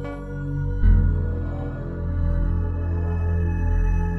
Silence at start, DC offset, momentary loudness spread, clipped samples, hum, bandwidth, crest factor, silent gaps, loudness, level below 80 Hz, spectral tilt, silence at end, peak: 0 s; under 0.1%; 9 LU; under 0.1%; none; 3.2 kHz; 14 dB; none; -25 LUFS; -24 dBFS; -10 dB/octave; 0 s; -6 dBFS